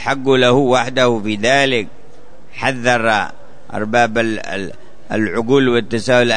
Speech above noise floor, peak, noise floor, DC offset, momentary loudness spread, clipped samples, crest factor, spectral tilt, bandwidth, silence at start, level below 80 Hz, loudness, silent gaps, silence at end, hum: 29 dB; -2 dBFS; -44 dBFS; 4%; 13 LU; under 0.1%; 16 dB; -4.5 dB/octave; 9.6 kHz; 0 s; -50 dBFS; -15 LUFS; none; 0 s; none